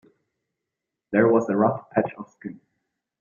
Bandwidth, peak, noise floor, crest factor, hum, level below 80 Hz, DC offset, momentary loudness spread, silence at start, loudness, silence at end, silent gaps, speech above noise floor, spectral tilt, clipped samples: 7.2 kHz; -4 dBFS; -85 dBFS; 22 dB; none; -66 dBFS; under 0.1%; 20 LU; 1.1 s; -22 LUFS; 0.7 s; none; 62 dB; -9.5 dB/octave; under 0.1%